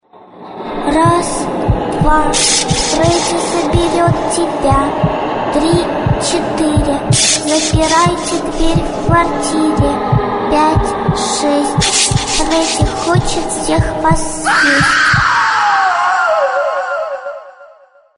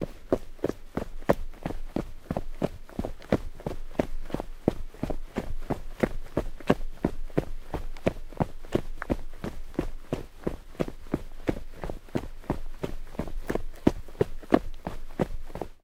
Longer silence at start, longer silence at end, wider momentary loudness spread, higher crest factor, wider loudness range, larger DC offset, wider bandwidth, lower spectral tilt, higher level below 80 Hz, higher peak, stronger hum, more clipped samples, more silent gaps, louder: first, 0.35 s vs 0 s; first, 0.5 s vs 0.1 s; second, 7 LU vs 10 LU; second, 14 dB vs 28 dB; about the same, 2 LU vs 4 LU; neither; second, 11 kHz vs 15.5 kHz; second, -4 dB/octave vs -7.5 dB/octave; first, -26 dBFS vs -36 dBFS; about the same, 0 dBFS vs -2 dBFS; neither; neither; neither; first, -13 LUFS vs -33 LUFS